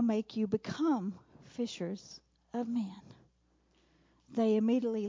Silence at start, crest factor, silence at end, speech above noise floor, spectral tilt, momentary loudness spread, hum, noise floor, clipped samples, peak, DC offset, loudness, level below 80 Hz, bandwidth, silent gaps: 0 s; 16 dB; 0 s; 39 dB; -6.5 dB/octave; 21 LU; none; -72 dBFS; under 0.1%; -20 dBFS; under 0.1%; -34 LUFS; -72 dBFS; 7.6 kHz; none